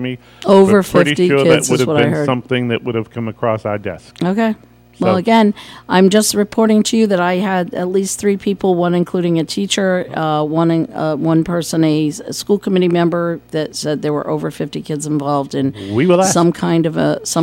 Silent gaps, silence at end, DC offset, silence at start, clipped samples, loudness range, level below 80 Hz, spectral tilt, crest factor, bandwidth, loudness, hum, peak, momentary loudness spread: none; 0 s; under 0.1%; 0 s; under 0.1%; 4 LU; -52 dBFS; -5.5 dB/octave; 14 dB; 16.5 kHz; -15 LUFS; none; 0 dBFS; 10 LU